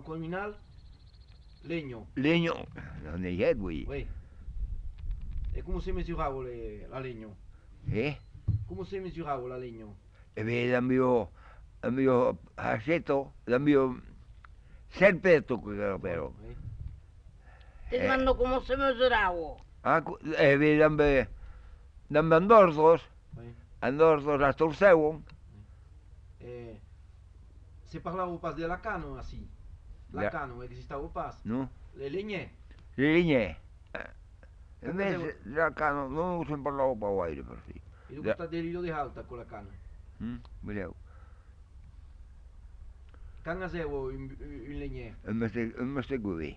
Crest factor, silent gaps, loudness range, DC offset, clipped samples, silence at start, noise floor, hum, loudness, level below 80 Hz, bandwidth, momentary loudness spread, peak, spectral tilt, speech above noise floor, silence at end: 22 dB; none; 15 LU; under 0.1%; under 0.1%; 0 s; -53 dBFS; none; -29 LUFS; -46 dBFS; 7.8 kHz; 21 LU; -8 dBFS; -7.5 dB/octave; 24 dB; 0 s